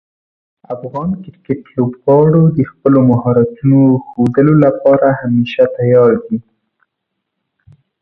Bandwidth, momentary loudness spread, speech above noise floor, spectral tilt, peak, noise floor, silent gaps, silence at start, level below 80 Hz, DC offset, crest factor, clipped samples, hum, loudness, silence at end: 4.6 kHz; 13 LU; 63 dB; -11 dB/octave; 0 dBFS; -74 dBFS; none; 0.7 s; -48 dBFS; under 0.1%; 12 dB; under 0.1%; none; -12 LUFS; 1.6 s